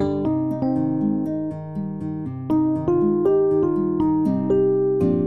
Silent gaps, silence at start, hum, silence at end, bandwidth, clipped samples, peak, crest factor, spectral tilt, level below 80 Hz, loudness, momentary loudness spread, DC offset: none; 0 s; none; 0 s; 4.3 kHz; under 0.1%; -8 dBFS; 12 dB; -11 dB/octave; -52 dBFS; -21 LUFS; 10 LU; 0.3%